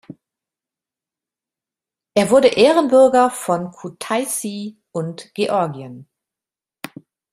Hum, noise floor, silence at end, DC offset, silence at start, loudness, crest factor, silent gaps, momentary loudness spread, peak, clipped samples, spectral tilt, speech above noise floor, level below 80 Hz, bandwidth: none; -90 dBFS; 1.3 s; under 0.1%; 0.1 s; -17 LUFS; 18 dB; none; 23 LU; 0 dBFS; under 0.1%; -4.5 dB/octave; 73 dB; -62 dBFS; 15.5 kHz